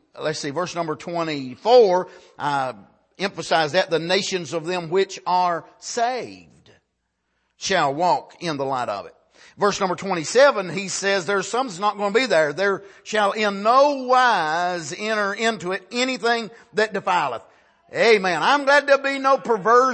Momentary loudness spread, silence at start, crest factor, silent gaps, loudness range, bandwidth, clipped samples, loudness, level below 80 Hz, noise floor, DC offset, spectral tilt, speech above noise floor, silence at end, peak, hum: 12 LU; 0.15 s; 18 dB; none; 5 LU; 8.8 kHz; under 0.1%; -21 LUFS; -68 dBFS; -74 dBFS; under 0.1%; -3.5 dB/octave; 53 dB; 0 s; -2 dBFS; none